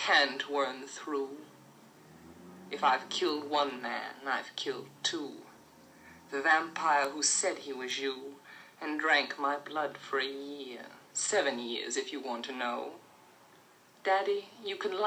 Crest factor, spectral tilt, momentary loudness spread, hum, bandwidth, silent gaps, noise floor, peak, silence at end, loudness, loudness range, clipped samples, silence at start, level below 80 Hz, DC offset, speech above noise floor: 22 dB; -1 dB/octave; 16 LU; none; 18.5 kHz; none; -60 dBFS; -12 dBFS; 0 s; -32 LUFS; 4 LU; under 0.1%; 0 s; -84 dBFS; under 0.1%; 28 dB